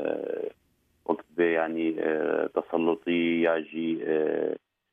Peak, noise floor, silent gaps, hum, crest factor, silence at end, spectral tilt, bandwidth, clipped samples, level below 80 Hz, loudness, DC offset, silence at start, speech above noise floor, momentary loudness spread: -10 dBFS; -69 dBFS; none; none; 18 dB; 0.35 s; -8 dB/octave; 3.7 kHz; under 0.1%; -74 dBFS; -28 LUFS; under 0.1%; 0 s; 42 dB; 8 LU